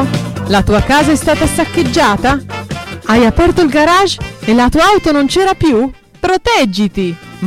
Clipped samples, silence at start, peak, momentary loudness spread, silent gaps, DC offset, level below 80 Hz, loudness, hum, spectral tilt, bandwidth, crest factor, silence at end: under 0.1%; 0 s; -2 dBFS; 10 LU; none; under 0.1%; -26 dBFS; -11 LUFS; none; -5 dB/octave; 16.5 kHz; 8 dB; 0 s